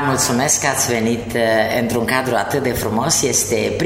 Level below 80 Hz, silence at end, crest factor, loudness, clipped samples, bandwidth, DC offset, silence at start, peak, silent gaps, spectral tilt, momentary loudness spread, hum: -42 dBFS; 0 s; 14 dB; -17 LUFS; under 0.1%; 16.5 kHz; under 0.1%; 0 s; -4 dBFS; none; -3 dB/octave; 5 LU; none